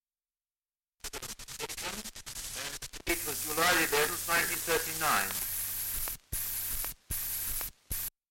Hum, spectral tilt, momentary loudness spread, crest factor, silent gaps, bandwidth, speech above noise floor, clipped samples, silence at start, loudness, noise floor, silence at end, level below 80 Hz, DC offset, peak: none; -1 dB/octave; 13 LU; 18 dB; none; 17 kHz; over 60 dB; under 0.1%; 1.05 s; -32 LUFS; under -90 dBFS; 0.2 s; -50 dBFS; under 0.1%; -16 dBFS